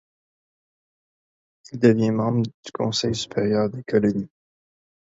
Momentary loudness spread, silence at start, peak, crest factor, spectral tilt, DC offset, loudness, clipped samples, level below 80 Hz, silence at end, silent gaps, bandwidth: 11 LU; 1.7 s; -2 dBFS; 22 dB; -6 dB/octave; under 0.1%; -22 LUFS; under 0.1%; -58 dBFS; 0.8 s; 2.54-2.63 s; 8 kHz